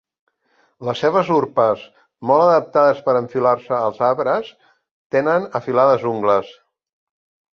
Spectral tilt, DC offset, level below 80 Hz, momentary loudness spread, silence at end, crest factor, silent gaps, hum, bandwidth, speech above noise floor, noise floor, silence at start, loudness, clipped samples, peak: -7 dB/octave; under 0.1%; -64 dBFS; 8 LU; 1.05 s; 16 dB; 4.91-5.10 s; none; 7 kHz; 45 dB; -62 dBFS; 0.8 s; -18 LUFS; under 0.1%; -2 dBFS